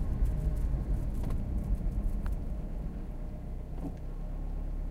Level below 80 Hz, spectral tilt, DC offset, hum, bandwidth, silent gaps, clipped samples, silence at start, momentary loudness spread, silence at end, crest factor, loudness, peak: -34 dBFS; -9 dB/octave; under 0.1%; none; 11 kHz; none; under 0.1%; 0 s; 9 LU; 0 s; 14 dB; -37 LUFS; -18 dBFS